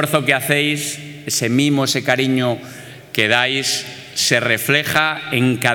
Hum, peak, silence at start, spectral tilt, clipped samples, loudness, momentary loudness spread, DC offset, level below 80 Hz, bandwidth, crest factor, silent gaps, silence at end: none; 0 dBFS; 0 s; -3.5 dB/octave; under 0.1%; -17 LUFS; 10 LU; under 0.1%; -60 dBFS; 19.5 kHz; 18 dB; none; 0 s